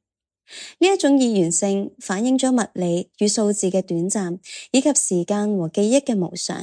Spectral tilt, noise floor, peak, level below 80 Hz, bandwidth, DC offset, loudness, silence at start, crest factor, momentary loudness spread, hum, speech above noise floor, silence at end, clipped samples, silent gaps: -4.5 dB/octave; -64 dBFS; -4 dBFS; -72 dBFS; 10.5 kHz; under 0.1%; -20 LUFS; 0.5 s; 18 dB; 8 LU; none; 44 dB; 0 s; under 0.1%; none